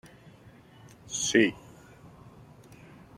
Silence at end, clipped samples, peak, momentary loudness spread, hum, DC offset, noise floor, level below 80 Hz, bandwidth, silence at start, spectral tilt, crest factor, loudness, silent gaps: 1.1 s; under 0.1%; -8 dBFS; 28 LU; none; under 0.1%; -54 dBFS; -64 dBFS; 14.5 kHz; 1.1 s; -3 dB/octave; 24 dB; -26 LUFS; none